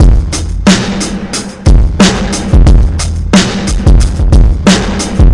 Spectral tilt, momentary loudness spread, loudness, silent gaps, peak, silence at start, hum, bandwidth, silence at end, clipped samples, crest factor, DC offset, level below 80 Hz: -5 dB/octave; 7 LU; -10 LUFS; none; 0 dBFS; 0 s; none; 11.5 kHz; 0 s; 0.7%; 6 dB; under 0.1%; -10 dBFS